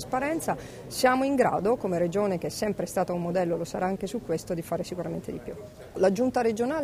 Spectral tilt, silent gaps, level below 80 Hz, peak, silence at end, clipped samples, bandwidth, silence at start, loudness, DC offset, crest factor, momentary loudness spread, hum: -5.5 dB/octave; none; -54 dBFS; -10 dBFS; 0 s; under 0.1%; 15.5 kHz; 0 s; -28 LUFS; under 0.1%; 18 dB; 11 LU; none